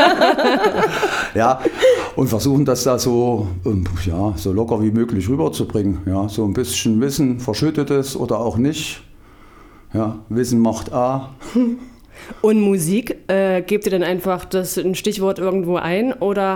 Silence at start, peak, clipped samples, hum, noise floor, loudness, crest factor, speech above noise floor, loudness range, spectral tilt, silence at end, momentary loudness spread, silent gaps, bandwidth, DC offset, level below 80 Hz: 0 s; 0 dBFS; under 0.1%; none; -44 dBFS; -18 LUFS; 18 dB; 25 dB; 4 LU; -5.5 dB/octave; 0 s; 6 LU; none; 19.5 kHz; under 0.1%; -40 dBFS